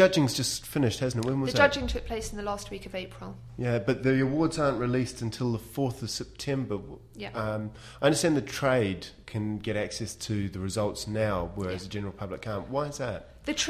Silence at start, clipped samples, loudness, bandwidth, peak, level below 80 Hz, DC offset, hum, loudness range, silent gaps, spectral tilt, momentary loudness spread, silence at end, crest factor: 0 s; under 0.1%; -29 LUFS; 15.5 kHz; -8 dBFS; -48 dBFS; under 0.1%; none; 4 LU; none; -5 dB/octave; 12 LU; 0 s; 22 dB